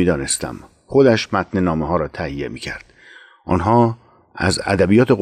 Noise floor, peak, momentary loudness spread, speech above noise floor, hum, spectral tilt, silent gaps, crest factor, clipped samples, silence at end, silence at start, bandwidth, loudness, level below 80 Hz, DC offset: -45 dBFS; -4 dBFS; 16 LU; 28 dB; none; -5.5 dB/octave; none; 14 dB; under 0.1%; 0 s; 0 s; 14 kHz; -18 LUFS; -42 dBFS; under 0.1%